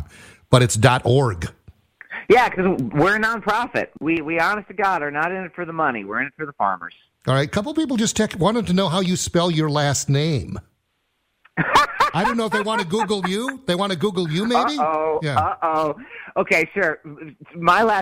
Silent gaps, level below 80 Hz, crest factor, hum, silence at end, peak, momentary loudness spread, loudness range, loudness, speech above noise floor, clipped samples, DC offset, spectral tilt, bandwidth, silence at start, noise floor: none; -50 dBFS; 20 dB; none; 0 s; -2 dBFS; 12 LU; 3 LU; -20 LUFS; 51 dB; under 0.1%; under 0.1%; -5 dB/octave; 16 kHz; 0 s; -71 dBFS